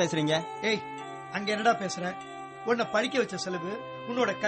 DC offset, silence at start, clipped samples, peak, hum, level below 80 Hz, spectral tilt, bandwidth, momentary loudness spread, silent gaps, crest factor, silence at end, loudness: under 0.1%; 0 s; under 0.1%; -12 dBFS; none; -70 dBFS; -4 dB/octave; 8.8 kHz; 11 LU; none; 18 dB; 0 s; -30 LUFS